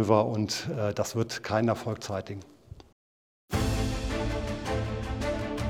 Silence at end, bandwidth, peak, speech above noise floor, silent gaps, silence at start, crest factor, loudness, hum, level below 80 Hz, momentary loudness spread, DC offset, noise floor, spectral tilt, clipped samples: 0 s; 17.5 kHz; -8 dBFS; over 62 dB; 2.92-3.48 s; 0 s; 20 dB; -30 LUFS; none; -40 dBFS; 7 LU; under 0.1%; under -90 dBFS; -5.5 dB/octave; under 0.1%